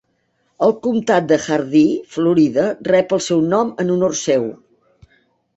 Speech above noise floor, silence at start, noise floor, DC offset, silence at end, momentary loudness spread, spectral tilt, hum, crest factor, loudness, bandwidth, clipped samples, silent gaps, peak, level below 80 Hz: 49 dB; 0.6 s; -65 dBFS; under 0.1%; 1.05 s; 4 LU; -5.5 dB/octave; none; 16 dB; -17 LUFS; 8.2 kHz; under 0.1%; none; -2 dBFS; -58 dBFS